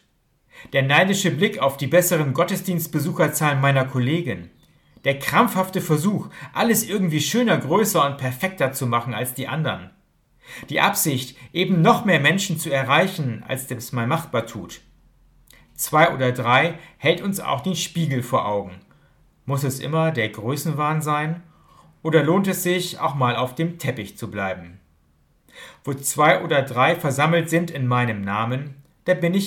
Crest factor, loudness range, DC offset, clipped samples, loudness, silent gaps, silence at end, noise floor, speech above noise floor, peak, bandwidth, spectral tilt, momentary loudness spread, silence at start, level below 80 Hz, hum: 20 dB; 5 LU; under 0.1%; under 0.1%; -21 LUFS; none; 0 s; -64 dBFS; 43 dB; -2 dBFS; 18 kHz; -5 dB/octave; 11 LU; 0.55 s; -60 dBFS; none